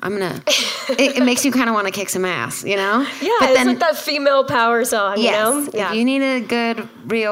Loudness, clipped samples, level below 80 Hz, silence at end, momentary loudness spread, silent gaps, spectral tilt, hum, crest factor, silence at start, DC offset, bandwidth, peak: -17 LUFS; under 0.1%; -62 dBFS; 0 s; 6 LU; none; -3 dB/octave; none; 16 dB; 0 s; under 0.1%; 16 kHz; -2 dBFS